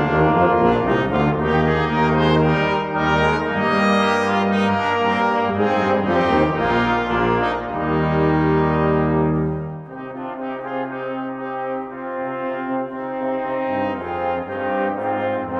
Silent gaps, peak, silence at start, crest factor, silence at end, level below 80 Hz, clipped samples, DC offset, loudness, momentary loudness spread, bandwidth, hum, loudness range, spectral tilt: none; -4 dBFS; 0 s; 16 dB; 0 s; -42 dBFS; under 0.1%; under 0.1%; -19 LUFS; 10 LU; 9.2 kHz; none; 8 LU; -7.5 dB/octave